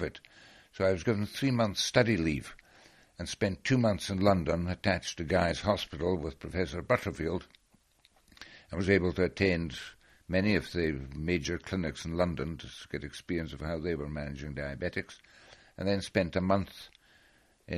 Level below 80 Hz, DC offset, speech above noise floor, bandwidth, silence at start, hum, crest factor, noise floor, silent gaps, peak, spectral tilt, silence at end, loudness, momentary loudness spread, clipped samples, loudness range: -50 dBFS; under 0.1%; 36 dB; 13 kHz; 0 s; none; 22 dB; -67 dBFS; none; -10 dBFS; -5.5 dB/octave; 0 s; -31 LUFS; 14 LU; under 0.1%; 6 LU